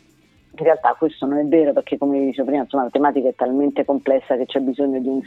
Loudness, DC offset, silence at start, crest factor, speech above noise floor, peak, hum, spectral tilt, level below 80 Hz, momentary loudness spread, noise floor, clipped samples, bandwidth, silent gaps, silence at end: -19 LUFS; under 0.1%; 0.6 s; 18 dB; 37 dB; -2 dBFS; none; -8 dB/octave; -64 dBFS; 5 LU; -55 dBFS; under 0.1%; 4.2 kHz; none; 0 s